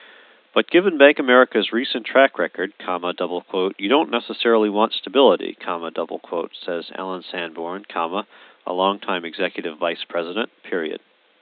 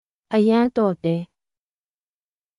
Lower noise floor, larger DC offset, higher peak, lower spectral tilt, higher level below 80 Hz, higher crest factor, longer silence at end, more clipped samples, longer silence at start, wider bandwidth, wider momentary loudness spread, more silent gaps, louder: second, -49 dBFS vs under -90 dBFS; neither; first, 0 dBFS vs -8 dBFS; about the same, -9 dB/octave vs -8.5 dB/octave; second, -84 dBFS vs -62 dBFS; first, 20 dB vs 14 dB; second, 0.45 s vs 1.35 s; neither; first, 0.55 s vs 0.3 s; second, 4.8 kHz vs 11 kHz; first, 14 LU vs 10 LU; neither; about the same, -21 LUFS vs -20 LUFS